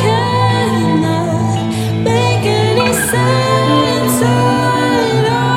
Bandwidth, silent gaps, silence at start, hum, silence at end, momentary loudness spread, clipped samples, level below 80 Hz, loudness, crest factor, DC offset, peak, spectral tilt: 16.5 kHz; none; 0 s; none; 0 s; 3 LU; under 0.1%; -42 dBFS; -13 LUFS; 12 dB; under 0.1%; 0 dBFS; -5.5 dB/octave